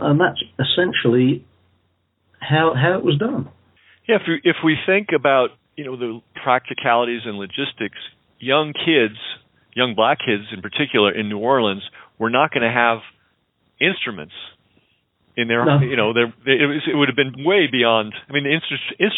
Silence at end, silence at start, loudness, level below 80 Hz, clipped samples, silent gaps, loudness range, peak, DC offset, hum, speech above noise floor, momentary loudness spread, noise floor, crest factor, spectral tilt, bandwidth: 0 s; 0 s; -19 LUFS; -66 dBFS; under 0.1%; none; 4 LU; 0 dBFS; under 0.1%; none; 47 dB; 14 LU; -66 dBFS; 18 dB; -10.5 dB/octave; 4.1 kHz